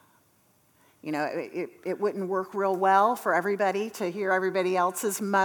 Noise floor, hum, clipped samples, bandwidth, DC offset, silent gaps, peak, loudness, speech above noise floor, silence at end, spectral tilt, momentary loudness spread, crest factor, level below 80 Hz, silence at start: -65 dBFS; none; under 0.1%; over 20 kHz; under 0.1%; none; -8 dBFS; -27 LUFS; 38 dB; 0 s; -4.5 dB/octave; 11 LU; 18 dB; -84 dBFS; 1.05 s